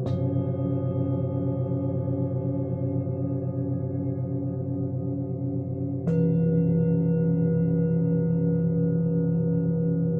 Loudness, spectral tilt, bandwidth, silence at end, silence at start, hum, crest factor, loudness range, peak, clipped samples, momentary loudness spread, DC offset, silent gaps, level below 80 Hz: -26 LUFS; -13 dB/octave; 2.9 kHz; 0 s; 0 s; none; 12 dB; 5 LU; -12 dBFS; under 0.1%; 7 LU; under 0.1%; none; -48 dBFS